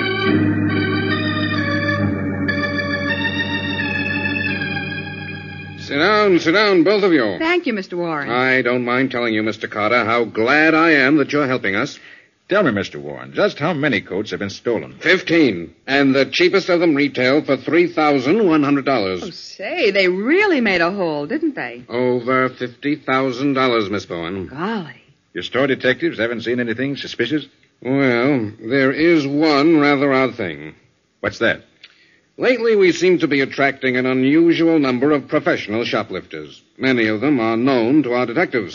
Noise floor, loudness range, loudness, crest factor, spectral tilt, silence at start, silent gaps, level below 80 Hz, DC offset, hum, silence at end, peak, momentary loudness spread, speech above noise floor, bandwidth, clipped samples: -54 dBFS; 5 LU; -17 LUFS; 16 dB; -4 dB/octave; 0 s; none; -58 dBFS; under 0.1%; none; 0 s; -2 dBFS; 11 LU; 37 dB; 7.2 kHz; under 0.1%